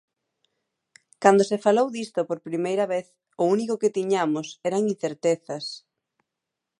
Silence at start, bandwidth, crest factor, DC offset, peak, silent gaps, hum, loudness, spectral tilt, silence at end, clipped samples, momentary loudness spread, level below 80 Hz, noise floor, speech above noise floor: 1.2 s; 11.5 kHz; 22 dB; under 0.1%; -2 dBFS; none; none; -24 LUFS; -5 dB/octave; 1 s; under 0.1%; 10 LU; -78 dBFS; -85 dBFS; 61 dB